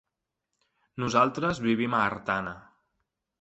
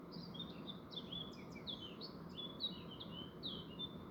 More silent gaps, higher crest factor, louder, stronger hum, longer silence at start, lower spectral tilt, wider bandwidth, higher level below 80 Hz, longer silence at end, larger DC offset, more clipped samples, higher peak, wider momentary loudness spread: neither; about the same, 22 dB vs 18 dB; first, -27 LUFS vs -48 LUFS; neither; first, 0.95 s vs 0 s; about the same, -5.5 dB/octave vs -6 dB/octave; second, 8.2 kHz vs over 20 kHz; first, -60 dBFS vs -70 dBFS; first, 0.8 s vs 0 s; neither; neither; first, -8 dBFS vs -32 dBFS; first, 15 LU vs 6 LU